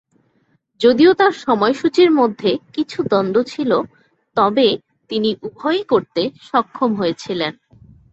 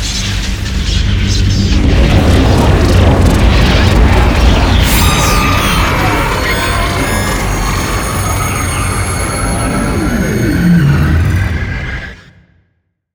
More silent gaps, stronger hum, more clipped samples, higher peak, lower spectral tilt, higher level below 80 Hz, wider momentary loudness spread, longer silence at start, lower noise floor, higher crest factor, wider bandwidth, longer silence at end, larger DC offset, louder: neither; neither; second, under 0.1% vs 0.3%; about the same, -2 dBFS vs 0 dBFS; about the same, -6 dB/octave vs -5 dB/octave; second, -60 dBFS vs -14 dBFS; first, 11 LU vs 6 LU; first, 0.8 s vs 0 s; about the same, -62 dBFS vs -62 dBFS; first, 16 dB vs 10 dB; second, 8 kHz vs over 20 kHz; second, 0.6 s vs 1 s; neither; second, -17 LUFS vs -11 LUFS